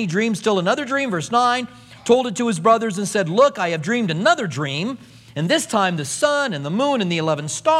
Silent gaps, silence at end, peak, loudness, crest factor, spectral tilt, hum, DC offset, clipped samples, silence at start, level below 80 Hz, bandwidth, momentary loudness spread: none; 0 s; -2 dBFS; -19 LUFS; 18 dB; -4.5 dB/octave; none; under 0.1%; under 0.1%; 0 s; -64 dBFS; 15 kHz; 7 LU